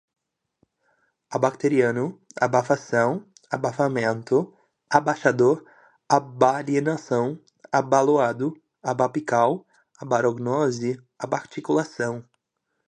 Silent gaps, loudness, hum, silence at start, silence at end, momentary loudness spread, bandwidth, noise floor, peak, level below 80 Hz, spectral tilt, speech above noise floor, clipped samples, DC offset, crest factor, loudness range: none; -23 LUFS; none; 1.3 s; 0.65 s; 11 LU; 10 kHz; -78 dBFS; 0 dBFS; -70 dBFS; -6 dB/octave; 55 dB; under 0.1%; under 0.1%; 22 dB; 2 LU